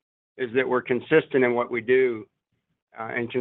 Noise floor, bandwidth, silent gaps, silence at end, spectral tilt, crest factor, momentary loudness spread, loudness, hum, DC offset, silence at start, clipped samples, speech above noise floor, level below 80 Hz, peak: -77 dBFS; 4 kHz; 2.82-2.87 s; 0 s; -9.5 dB/octave; 18 dB; 11 LU; -24 LUFS; none; under 0.1%; 0.4 s; under 0.1%; 53 dB; -70 dBFS; -6 dBFS